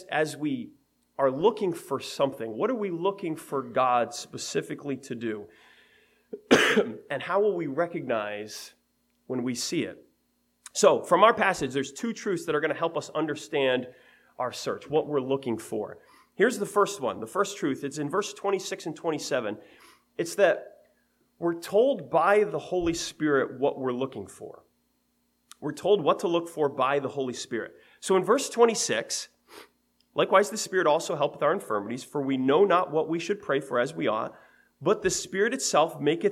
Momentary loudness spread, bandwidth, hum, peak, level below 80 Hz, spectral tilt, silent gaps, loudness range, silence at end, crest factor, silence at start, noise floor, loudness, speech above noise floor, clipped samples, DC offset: 12 LU; 16 kHz; none; -4 dBFS; -64 dBFS; -4 dB/octave; none; 5 LU; 0 s; 24 dB; 0 s; -72 dBFS; -27 LUFS; 45 dB; under 0.1%; under 0.1%